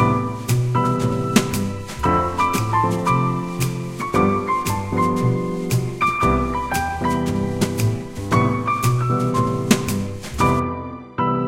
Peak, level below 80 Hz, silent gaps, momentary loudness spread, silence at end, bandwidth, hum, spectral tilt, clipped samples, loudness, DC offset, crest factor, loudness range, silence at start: 0 dBFS; -38 dBFS; none; 5 LU; 0 s; 16.5 kHz; none; -6 dB/octave; under 0.1%; -20 LUFS; 0.2%; 20 dB; 1 LU; 0 s